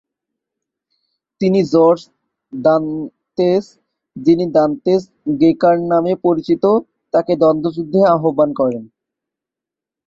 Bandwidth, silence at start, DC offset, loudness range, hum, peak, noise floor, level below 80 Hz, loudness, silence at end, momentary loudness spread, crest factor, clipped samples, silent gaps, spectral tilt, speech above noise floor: 7.4 kHz; 1.4 s; under 0.1%; 2 LU; none; -2 dBFS; -86 dBFS; -58 dBFS; -15 LUFS; 1.2 s; 7 LU; 14 dB; under 0.1%; none; -8.5 dB/octave; 72 dB